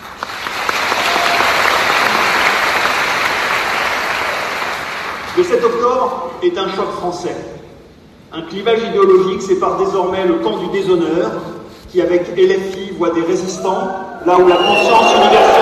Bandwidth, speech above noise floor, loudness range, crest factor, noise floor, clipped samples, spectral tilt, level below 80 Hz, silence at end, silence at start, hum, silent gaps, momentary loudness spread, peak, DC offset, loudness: 14 kHz; 28 dB; 5 LU; 14 dB; -41 dBFS; under 0.1%; -3.5 dB/octave; -48 dBFS; 0 s; 0 s; none; none; 12 LU; 0 dBFS; under 0.1%; -14 LUFS